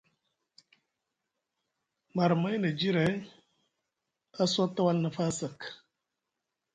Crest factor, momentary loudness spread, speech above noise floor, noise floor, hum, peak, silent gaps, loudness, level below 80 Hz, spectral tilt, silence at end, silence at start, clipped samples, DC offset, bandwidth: 18 dB; 12 LU; 57 dB; -86 dBFS; none; -14 dBFS; none; -30 LUFS; -70 dBFS; -5.5 dB/octave; 1 s; 2.15 s; under 0.1%; under 0.1%; 9.4 kHz